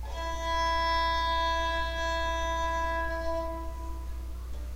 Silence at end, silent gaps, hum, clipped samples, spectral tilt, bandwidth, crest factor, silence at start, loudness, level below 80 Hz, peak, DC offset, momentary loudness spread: 0 s; none; none; under 0.1%; -4 dB/octave; 16 kHz; 12 dB; 0 s; -30 LUFS; -36 dBFS; -18 dBFS; under 0.1%; 13 LU